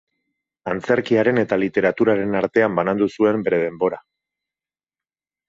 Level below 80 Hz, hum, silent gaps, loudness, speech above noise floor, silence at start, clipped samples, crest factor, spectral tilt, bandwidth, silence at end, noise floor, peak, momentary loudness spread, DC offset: -58 dBFS; none; none; -19 LUFS; over 71 dB; 0.65 s; under 0.1%; 18 dB; -7.5 dB/octave; 7.6 kHz; 1.5 s; under -90 dBFS; -4 dBFS; 7 LU; under 0.1%